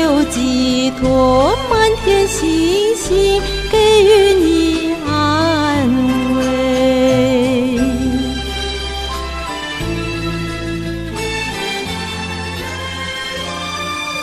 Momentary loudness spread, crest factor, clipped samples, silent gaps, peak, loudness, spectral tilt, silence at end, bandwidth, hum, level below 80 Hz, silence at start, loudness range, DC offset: 11 LU; 14 dB; under 0.1%; none; 0 dBFS; -15 LUFS; -4.5 dB/octave; 0 s; 15.5 kHz; none; -30 dBFS; 0 s; 9 LU; 0.1%